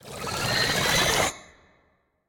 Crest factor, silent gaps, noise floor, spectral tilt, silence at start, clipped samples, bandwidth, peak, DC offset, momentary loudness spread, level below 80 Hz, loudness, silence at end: 20 dB; none; -67 dBFS; -2 dB/octave; 0.05 s; under 0.1%; 18 kHz; -8 dBFS; under 0.1%; 10 LU; -48 dBFS; -23 LUFS; 0.85 s